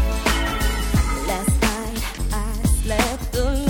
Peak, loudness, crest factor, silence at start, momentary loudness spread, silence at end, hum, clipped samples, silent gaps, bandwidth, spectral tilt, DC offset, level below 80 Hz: -4 dBFS; -22 LUFS; 16 dB; 0 s; 6 LU; 0 s; none; under 0.1%; none; 18.5 kHz; -4.5 dB/octave; under 0.1%; -24 dBFS